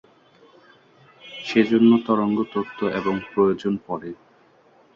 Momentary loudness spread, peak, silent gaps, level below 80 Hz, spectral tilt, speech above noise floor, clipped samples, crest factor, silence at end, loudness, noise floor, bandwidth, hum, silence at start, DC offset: 17 LU; -4 dBFS; none; -62 dBFS; -7.5 dB/octave; 35 dB; under 0.1%; 18 dB; 0.8 s; -21 LUFS; -56 dBFS; 7 kHz; none; 1.25 s; under 0.1%